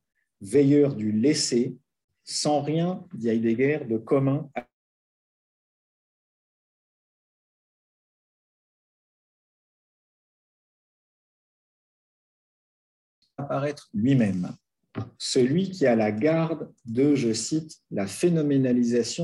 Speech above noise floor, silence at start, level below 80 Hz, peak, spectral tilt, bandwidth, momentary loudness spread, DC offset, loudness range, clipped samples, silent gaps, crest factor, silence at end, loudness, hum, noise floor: over 66 dB; 0.4 s; -70 dBFS; -10 dBFS; -5.5 dB/octave; 12 kHz; 11 LU; under 0.1%; 8 LU; under 0.1%; 2.04-2.08 s, 4.73-13.22 s; 18 dB; 0 s; -24 LUFS; none; under -90 dBFS